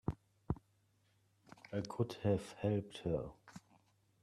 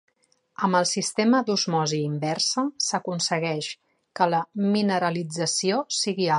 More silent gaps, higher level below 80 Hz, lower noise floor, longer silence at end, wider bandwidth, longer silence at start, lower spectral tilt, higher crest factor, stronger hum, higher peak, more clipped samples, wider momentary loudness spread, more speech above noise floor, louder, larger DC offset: neither; first, -60 dBFS vs -74 dBFS; first, -76 dBFS vs -66 dBFS; first, 0.65 s vs 0 s; first, 13 kHz vs 11.5 kHz; second, 0.05 s vs 0.6 s; first, -7.5 dB/octave vs -4 dB/octave; about the same, 20 dB vs 18 dB; neither; second, -22 dBFS vs -6 dBFS; neither; first, 21 LU vs 6 LU; second, 37 dB vs 42 dB; second, -41 LUFS vs -24 LUFS; neither